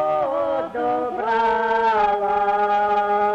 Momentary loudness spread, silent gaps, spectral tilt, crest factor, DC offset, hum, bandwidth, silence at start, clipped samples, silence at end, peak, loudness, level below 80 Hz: 5 LU; none; -5.5 dB/octave; 12 dB; under 0.1%; none; 7.8 kHz; 0 s; under 0.1%; 0 s; -8 dBFS; -20 LUFS; -54 dBFS